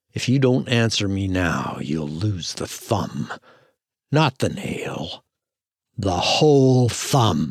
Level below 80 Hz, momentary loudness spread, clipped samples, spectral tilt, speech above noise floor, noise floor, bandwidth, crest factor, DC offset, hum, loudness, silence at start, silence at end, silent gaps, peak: -50 dBFS; 15 LU; under 0.1%; -5.5 dB/octave; 68 dB; -88 dBFS; 14.5 kHz; 18 dB; under 0.1%; none; -21 LUFS; 0.15 s; 0 s; none; -4 dBFS